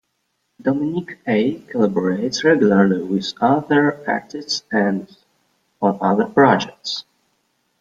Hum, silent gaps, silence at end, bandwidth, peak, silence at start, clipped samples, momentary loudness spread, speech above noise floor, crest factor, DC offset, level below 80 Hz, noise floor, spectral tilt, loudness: none; none; 0.8 s; 7.8 kHz; -2 dBFS; 0.65 s; under 0.1%; 11 LU; 53 dB; 18 dB; under 0.1%; -60 dBFS; -71 dBFS; -5.5 dB/octave; -19 LUFS